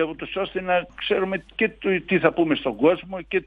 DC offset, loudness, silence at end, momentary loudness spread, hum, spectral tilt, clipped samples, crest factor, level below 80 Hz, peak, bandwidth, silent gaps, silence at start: under 0.1%; -23 LUFS; 0.05 s; 7 LU; none; -8 dB/octave; under 0.1%; 18 dB; -52 dBFS; -4 dBFS; 4.9 kHz; none; 0 s